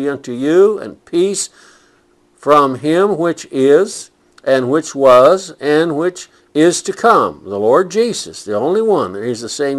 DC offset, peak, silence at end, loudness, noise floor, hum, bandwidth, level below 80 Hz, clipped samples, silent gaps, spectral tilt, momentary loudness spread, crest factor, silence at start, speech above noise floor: under 0.1%; 0 dBFS; 0 s; -14 LUFS; -54 dBFS; none; 12.5 kHz; -58 dBFS; 0.2%; none; -4.5 dB/octave; 10 LU; 14 dB; 0 s; 40 dB